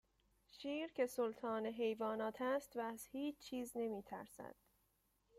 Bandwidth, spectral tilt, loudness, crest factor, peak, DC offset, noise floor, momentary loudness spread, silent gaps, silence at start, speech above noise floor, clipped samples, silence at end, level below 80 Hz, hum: 16 kHz; -4.5 dB/octave; -44 LUFS; 18 dB; -26 dBFS; under 0.1%; -81 dBFS; 11 LU; none; 0.55 s; 37 dB; under 0.1%; 0.85 s; -80 dBFS; none